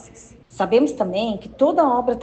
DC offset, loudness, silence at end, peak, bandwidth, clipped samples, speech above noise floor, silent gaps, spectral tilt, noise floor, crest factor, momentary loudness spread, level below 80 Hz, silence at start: under 0.1%; -20 LUFS; 0 s; -4 dBFS; 8.8 kHz; under 0.1%; 27 dB; none; -6 dB/octave; -46 dBFS; 16 dB; 8 LU; -52 dBFS; 0.55 s